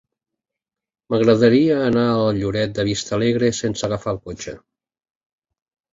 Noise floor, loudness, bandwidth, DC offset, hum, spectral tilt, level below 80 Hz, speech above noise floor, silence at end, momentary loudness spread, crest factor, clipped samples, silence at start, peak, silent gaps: -86 dBFS; -19 LUFS; 7.8 kHz; under 0.1%; none; -6 dB/octave; -48 dBFS; 68 dB; 1.35 s; 13 LU; 18 dB; under 0.1%; 1.1 s; -2 dBFS; none